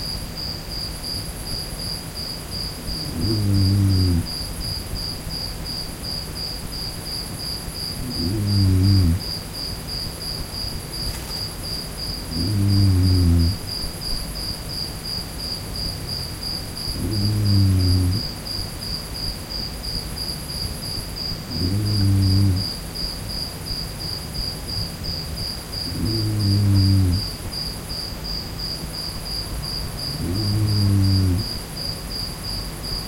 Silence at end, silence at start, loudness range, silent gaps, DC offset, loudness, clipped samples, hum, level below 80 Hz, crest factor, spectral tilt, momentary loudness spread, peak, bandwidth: 0 s; 0 s; 5 LU; none; under 0.1%; -23 LUFS; under 0.1%; none; -34 dBFS; 16 dB; -5 dB/octave; 10 LU; -6 dBFS; 16.5 kHz